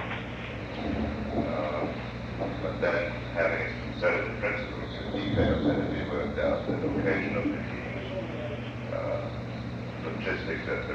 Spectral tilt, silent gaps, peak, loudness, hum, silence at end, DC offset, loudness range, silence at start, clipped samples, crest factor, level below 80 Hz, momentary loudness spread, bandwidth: -7.5 dB/octave; none; -14 dBFS; -31 LUFS; 60 Hz at -40 dBFS; 0 s; under 0.1%; 4 LU; 0 s; under 0.1%; 18 dB; -44 dBFS; 8 LU; 7.8 kHz